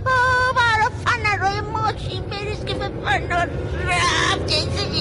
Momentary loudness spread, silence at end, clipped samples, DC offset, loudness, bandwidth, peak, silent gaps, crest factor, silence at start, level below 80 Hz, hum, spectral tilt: 9 LU; 0 s; under 0.1%; under 0.1%; -20 LUFS; 11.5 kHz; -8 dBFS; none; 12 dB; 0 s; -34 dBFS; none; -4 dB/octave